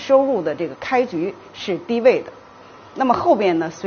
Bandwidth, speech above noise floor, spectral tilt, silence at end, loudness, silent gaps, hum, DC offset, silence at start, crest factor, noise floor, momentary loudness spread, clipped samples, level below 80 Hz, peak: 6.8 kHz; 24 dB; -4 dB/octave; 0 s; -19 LUFS; none; none; under 0.1%; 0 s; 18 dB; -43 dBFS; 12 LU; under 0.1%; -60 dBFS; -2 dBFS